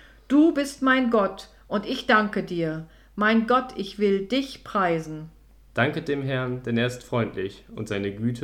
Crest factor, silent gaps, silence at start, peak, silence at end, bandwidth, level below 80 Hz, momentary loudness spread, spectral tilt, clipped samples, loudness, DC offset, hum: 20 dB; none; 0.3 s; -6 dBFS; 0 s; 15.5 kHz; -54 dBFS; 13 LU; -6 dB/octave; under 0.1%; -24 LUFS; under 0.1%; none